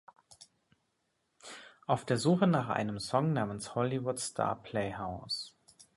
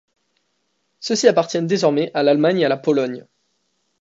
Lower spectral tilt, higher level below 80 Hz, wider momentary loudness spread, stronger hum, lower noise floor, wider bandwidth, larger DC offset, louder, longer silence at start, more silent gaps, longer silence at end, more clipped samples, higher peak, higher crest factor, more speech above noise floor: about the same, -5.5 dB/octave vs -5 dB/octave; first, -64 dBFS vs -70 dBFS; first, 19 LU vs 10 LU; neither; first, -79 dBFS vs -70 dBFS; first, 11.5 kHz vs 8 kHz; neither; second, -33 LUFS vs -18 LUFS; second, 0.3 s vs 1 s; neither; second, 0.45 s vs 0.8 s; neither; second, -14 dBFS vs 0 dBFS; about the same, 20 dB vs 18 dB; second, 47 dB vs 53 dB